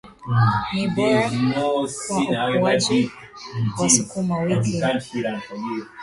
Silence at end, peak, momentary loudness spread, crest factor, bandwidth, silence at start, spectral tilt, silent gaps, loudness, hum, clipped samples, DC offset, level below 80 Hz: 0 s; -2 dBFS; 11 LU; 20 dB; 11.5 kHz; 0.05 s; -4.5 dB/octave; none; -21 LUFS; none; under 0.1%; under 0.1%; -52 dBFS